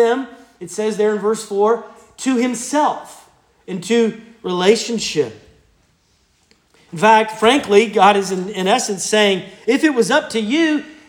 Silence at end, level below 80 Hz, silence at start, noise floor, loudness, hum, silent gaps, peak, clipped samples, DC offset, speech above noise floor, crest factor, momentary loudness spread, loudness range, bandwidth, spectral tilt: 0.15 s; -62 dBFS; 0 s; -59 dBFS; -16 LUFS; none; none; 0 dBFS; under 0.1%; under 0.1%; 43 dB; 16 dB; 12 LU; 6 LU; 17 kHz; -3.5 dB/octave